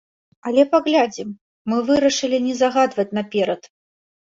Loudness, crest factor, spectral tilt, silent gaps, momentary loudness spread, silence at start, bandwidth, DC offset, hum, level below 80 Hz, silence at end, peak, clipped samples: -19 LUFS; 18 dB; -4 dB/octave; 1.41-1.65 s; 15 LU; 0.45 s; 7.8 kHz; under 0.1%; none; -62 dBFS; 0.65 s; -2 dBFS; under 0.1%